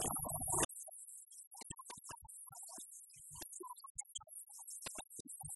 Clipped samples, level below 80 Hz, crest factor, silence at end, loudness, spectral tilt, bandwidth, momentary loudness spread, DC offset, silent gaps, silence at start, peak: under 0.1%; -64 dBFS; 26 dB; 0 s; -45 LUFS; -2 dB/octave; 12 kHz; 16 LU; under 0.1%; 0.65-0.69 s, 1.47-1.51 s, 3.90-3.95 s, 5.20-5.25 s; 0 s; -20 dBFS